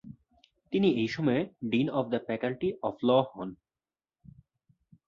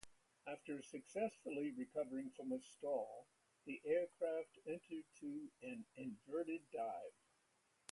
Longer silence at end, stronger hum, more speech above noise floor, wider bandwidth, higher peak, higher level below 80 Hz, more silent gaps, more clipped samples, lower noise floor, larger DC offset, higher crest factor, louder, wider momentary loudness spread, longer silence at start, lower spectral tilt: first, 1.55 s vs 0.8 s; neither; first, over 61 dB vs 34 dB; second, 7.2 kHz vs 11.5 kHz; first, -12 dBFS vs -28 dBFS; first, -66 dBFS vs -88 dBFS; neither; neither; first, under -90 dBFS vs -80 dBFS; neither; about the same, 20 dB vs 20 dB; first, -29 LUFS vs -47 LUFS; second, 8 LU vs 11 LU; about the same, 0.05 s vs 0.05 s; first, -7.5 dB/octave vs -5.5 dB/octave